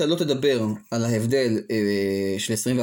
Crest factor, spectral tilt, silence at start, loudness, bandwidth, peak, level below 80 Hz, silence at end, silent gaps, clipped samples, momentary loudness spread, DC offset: 14 dB; -5 dB/octave; 0 s; -23 LUFS; 17 kHz; -8 dBFS; -62 dBFS; 0 s; none; under 0.1%; 4 LU; under 0.1%